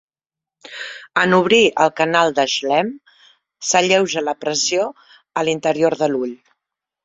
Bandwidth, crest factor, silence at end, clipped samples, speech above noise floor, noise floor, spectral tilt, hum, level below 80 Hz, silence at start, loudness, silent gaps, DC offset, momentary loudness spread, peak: 8 kHz; 18 dB; 0.7 s; under 0.1%; 72 dB; -89 dBFS; -3 dB/octave; none; -62 dBFS; 0.65 s; -17 LUFS; none; under 0.1%; 14 LU; -2 dBFS